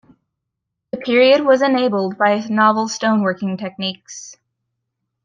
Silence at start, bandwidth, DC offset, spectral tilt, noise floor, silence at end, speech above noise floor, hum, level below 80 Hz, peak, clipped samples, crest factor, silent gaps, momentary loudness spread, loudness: 0.95 s; 9.2 kHz; under 0.1%; -4.5 dB/octave; -79 dBFS; 0.9 s; 62 dB; none; -68 dBFS; -2 dBFS; under 0.1%; 16 dB; none; 17 LU; -16 LUFS